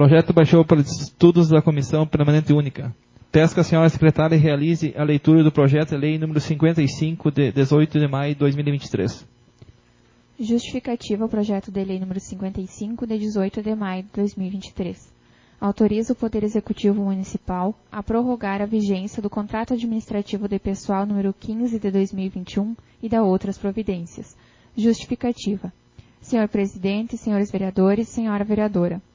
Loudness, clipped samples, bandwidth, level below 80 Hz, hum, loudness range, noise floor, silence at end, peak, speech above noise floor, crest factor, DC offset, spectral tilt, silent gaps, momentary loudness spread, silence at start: -21 LUFS; under 0.1%; 7.6 kHz; -48 dBFS; none; 8 LU; -56 dBFS; 0.15 s; -2 dBFS; 36 dB; 20 dB; under 0.1%; -7.5 dB/octave; none; 13 LU; 0 s